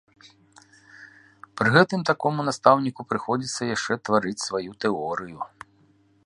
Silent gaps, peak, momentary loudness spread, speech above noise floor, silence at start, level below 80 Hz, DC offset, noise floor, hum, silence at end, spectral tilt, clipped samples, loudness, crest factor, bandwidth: none; -2 dBFS; 13 LU; 37 dB; 1 s; -64 dBFS; under 0.1%; -60 dBFS; none; 0.8 s; -5 dB/octave; under 0.1%; -23 LUFS; 24 dB; 11.5 kHz